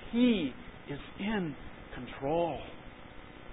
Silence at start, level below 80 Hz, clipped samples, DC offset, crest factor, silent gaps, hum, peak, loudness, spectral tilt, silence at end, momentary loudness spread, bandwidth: 0 s; -54 dBFS; under 0.1%; under 0.1%; 18 dB; none; none; -16 dBFS; -34 LUFS; -4 dB/octave; 0 s; 22 LU; 3.9 kHz